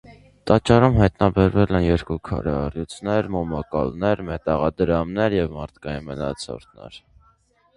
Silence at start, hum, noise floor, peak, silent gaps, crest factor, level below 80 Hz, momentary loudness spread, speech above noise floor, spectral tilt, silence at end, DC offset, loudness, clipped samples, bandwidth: 0.1 s; none; -60 dBFS; 0 dBFS; none; 22 dB; -36 dBFS; 16 LU; 39 dB; -7.5 dB/octave; 0.8 s; under 0.1%; -21 LUFS; under 0.1%; 11 kHz